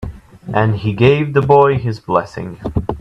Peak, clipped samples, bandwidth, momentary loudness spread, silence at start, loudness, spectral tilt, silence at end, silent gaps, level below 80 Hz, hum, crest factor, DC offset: 0 dBFS; under 0.1%; 7.8 kHz; 16 LU; 0 s; -15 LUFS; -8.5 dB/octave; 0 s; none; -36 dBFS; none; 14 dB; under 0.1%